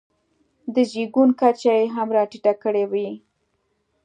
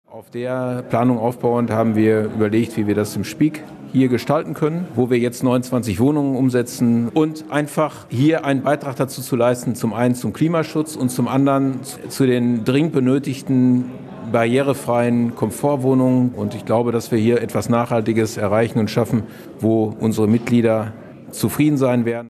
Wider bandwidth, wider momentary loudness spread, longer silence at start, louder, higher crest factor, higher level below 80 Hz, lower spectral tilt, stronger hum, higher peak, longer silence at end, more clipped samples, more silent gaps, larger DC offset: second, 9.4 kHz vs 14 kHz; first, 11 LU vs 6 LU; first, 0.65 s vs 0.1 s; about the same, -20 LUFS vs -19 LUFS; about the same, 18 dB vs 16 dB; second, -76 dBFS vs -58 dBFS; about the same, -6 dB/octave vs -7 dB/octave; neither; about the same, -4 dBFS vs -4 dBFS; first, 0.85 s vs 0.05 s; neither; neither; neither